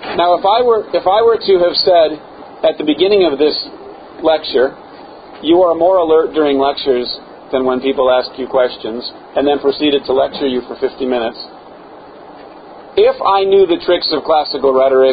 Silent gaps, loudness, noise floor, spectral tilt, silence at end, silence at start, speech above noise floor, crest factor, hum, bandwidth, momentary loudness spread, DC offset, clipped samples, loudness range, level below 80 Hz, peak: none; -13 LUFS; -36 dBFS; -9 dB/octave; 0 s; 0 s; 23 dB; 14 dB; none; 5 kHz; 10 LU; under 0.1%; under 0.1%; 4 LU; -48 dBFS; 0 dBFS